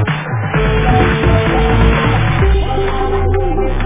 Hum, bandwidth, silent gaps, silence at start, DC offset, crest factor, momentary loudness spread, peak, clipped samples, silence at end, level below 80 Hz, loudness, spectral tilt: none; 3.8 kHz; none; 0 s; 0.2%; 12 dB; 5 LU; 0 dBFS; under 0.1%; 0 s; -18 dBFS; -14 LUFS; -11 dB/octave